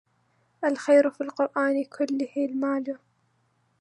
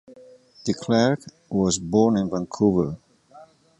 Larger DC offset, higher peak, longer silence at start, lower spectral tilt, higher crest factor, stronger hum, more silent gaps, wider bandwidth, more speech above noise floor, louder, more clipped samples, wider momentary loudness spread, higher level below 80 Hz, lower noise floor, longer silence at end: neither; about the same, -8 dBFS vs -6 dBFS; first, 0.6 s vs 0.1 s; about the same, -4.5 dB/octave vs -5.5 dB/octave; about the same, 18 dB vs 18 dB; neither; neither; about the same, 10.5 kHz vs 11 kHz; first, 44 dB vs 28 dB; second, -26 LUFS vs -23 LUFS; neither; about the same, 10 LU vs 10 LU; second, -84 dBFS vs -52 dBFS; first, -69 dBFS vs -50 dBFS; first, 0.85 s vs 0.35 s